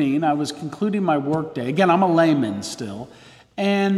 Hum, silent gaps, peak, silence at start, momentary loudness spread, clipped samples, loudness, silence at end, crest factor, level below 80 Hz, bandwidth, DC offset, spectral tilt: none; none; -4 dBFS; 0 s; 15 LU; under 0.1%; -21 LUFS; 0 s; 16 dB; -62 dBFS; 13 kHz; under 0.1%; -6 dB/octave